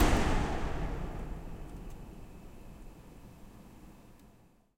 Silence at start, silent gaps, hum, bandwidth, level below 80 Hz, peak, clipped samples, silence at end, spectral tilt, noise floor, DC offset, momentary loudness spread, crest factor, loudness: 0 s; none; none; 15.5 kHz; -38 dBFS; -14 dBFS; under 0.1%; 0.45 s; -5.5 dB/octave; -62 dBFS; under 0.1%; 22 LU; 22 dB; -37 LUFS